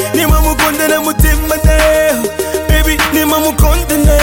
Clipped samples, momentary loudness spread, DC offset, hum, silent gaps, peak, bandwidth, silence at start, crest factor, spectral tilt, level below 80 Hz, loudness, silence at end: under 0.1%; 3 LU; under 0.1%; none; none; 0 dBFS; 17 kHz; 0 s; 10 dB; -4.5 dB/octave; -14 dBFS; -11 LUFS; 0 s